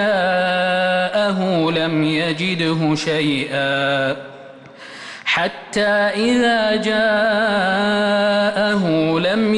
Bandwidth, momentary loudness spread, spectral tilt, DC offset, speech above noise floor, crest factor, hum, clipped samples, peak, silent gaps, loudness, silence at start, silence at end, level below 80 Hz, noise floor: 11.5 kHz; 4 LU; -5.5 dB/octave; under 0.1%; 21 dB; 10 dB; none; under 0.1%; -8 dBFS; none; -17 LUFS; 0 s; 0 s; -54 dBFS; -38 dBFS